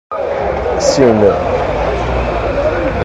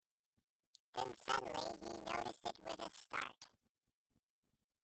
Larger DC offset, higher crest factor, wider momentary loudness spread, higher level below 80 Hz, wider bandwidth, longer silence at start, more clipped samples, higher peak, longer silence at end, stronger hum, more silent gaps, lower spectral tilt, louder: neither; second, 14 dB vs 24 dB; second, 7 LU vs 10 LU; first, -26 dBFS vs -76 dBFS; first, 11.5 kHz vs 8.8 kHz; second, 0.1 s vs 0.95 s; first, 0.2% vs under 0.1%; first, 0 dBFS vs -24 dBFS; second, 0 s vs 1.35 s; neither; neither; first, -5.5 dB/octave vs -3 dB/octave; first, -14 LUFS vs -45 LUFS